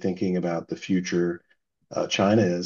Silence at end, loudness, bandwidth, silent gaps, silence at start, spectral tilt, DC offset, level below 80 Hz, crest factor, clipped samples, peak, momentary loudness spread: 0 s; -25 LUFS; 7.2 kHz; none; 0 s; -6 dB/octave; under 0.1%; -66 dBFS; 18 dB; under 0.1%; -8 dBFS; 10 LU